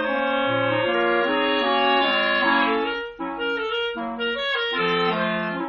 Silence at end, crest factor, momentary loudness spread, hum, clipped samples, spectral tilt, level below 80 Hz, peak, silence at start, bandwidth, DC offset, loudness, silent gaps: 0 s; 14 dB; 8 LU; none; under 0.1%; -1.5 dB/octave; -56 dBFS; -8 dBFS; 0 s; 6.8 kHz; under 0.1%; -22 LUFS; none